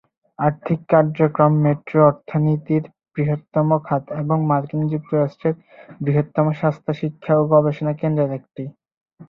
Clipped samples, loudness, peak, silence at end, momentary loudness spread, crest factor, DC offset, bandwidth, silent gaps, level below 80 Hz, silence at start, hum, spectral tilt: under 0.1%; -20 LUFS; -2 dBFS; 0.05 s; 9 LU; 18 dB; under 0.1%; 4.1 kHz; 8.97-9.06 s; -58 dBFS; 0.4 s; none; -11.5 dB/octave